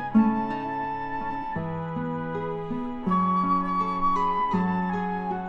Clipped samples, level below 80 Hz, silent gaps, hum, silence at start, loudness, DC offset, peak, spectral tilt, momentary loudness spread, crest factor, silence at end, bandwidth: under 0.1%; -48 dBFS; none; none; 0 s; -27 LUFS; under 0.1%; -10 dBFS; -9 dB/octave; 8 LU; 16 dB; 0 s; 6.6 kHz